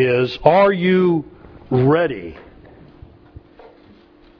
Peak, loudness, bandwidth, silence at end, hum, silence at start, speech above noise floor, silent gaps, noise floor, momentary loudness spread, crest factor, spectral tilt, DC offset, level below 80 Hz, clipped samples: 0 dBFS; -16 LUFS; 5.4 kHz; 2.05 s; none; 0 s; 32 dB; none; -48 dBFS; 17 LU; 18 dB; -9 dB/octave; under 0.1%; -48 dBFS; under 0.1%